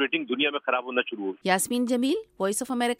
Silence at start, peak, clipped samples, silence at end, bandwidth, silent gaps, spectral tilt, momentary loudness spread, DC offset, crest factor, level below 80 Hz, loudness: 0 s; -10 dBFS; under 0.1%; 0.05 s; 16 kHz; none; -3 dB/octave; 4 LU; under 0.1%; 18 dB; -70 dBFS; -26 LUFS